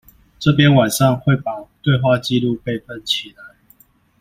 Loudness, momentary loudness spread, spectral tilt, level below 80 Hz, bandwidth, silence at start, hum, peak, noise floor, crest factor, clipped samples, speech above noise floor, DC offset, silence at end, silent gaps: -17 LUFS; 13 LU; -5.5 dB/octave; -48 dBFS; 15.5 kHz; 0.4 s; none; -2 dBFS; -53 dBFS; 16 dB; under 0.1%; 37 dB; under 0.1%; 0.7 s; none